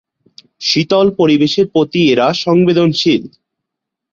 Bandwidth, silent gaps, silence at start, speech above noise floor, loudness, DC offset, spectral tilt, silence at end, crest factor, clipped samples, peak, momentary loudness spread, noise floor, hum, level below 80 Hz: 7.4 kHz; none; 0.6 s; 67 dB; -12 LUFS; under 0.1%; -5.5 dB/octave; 0.85 s; 14 dB; under 0.1%; 0 dBFS; 4 LU; -79 dBFS; none; -54 dBFS